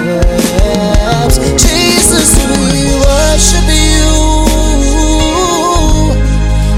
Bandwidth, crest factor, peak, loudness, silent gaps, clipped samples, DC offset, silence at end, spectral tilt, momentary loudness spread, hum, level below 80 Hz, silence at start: 16 kHz; 8 dB; 0 dBFS; -9 LUFS; none; 0.4%; under 0.1%; 0 s; -4 dB/octave; 4 LU; none; -12 dBFS; 0 s